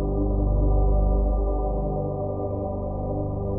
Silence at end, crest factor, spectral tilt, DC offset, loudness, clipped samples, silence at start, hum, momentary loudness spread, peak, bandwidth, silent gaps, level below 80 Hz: 0 s; 12 dB; -16 dB/octave; under 0.1%; -26 LUFS; under 0.1%; 0 s; 50 Hz at -25 dBFS; 6 LU; -12 dBFS; 1.3 kHz; none; -24 dBFS